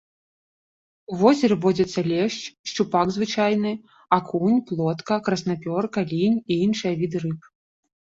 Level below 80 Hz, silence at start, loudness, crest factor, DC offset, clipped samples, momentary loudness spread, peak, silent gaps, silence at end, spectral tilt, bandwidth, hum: -60 dBFS; 1.1 s; -23 LUFS; 20 dB; under 0.1%; under 0.1%; 9 LU; -4 dBFS; 2.59-2.64 s; 0.7 s; -6 dB/octave; 7.8 kHz; none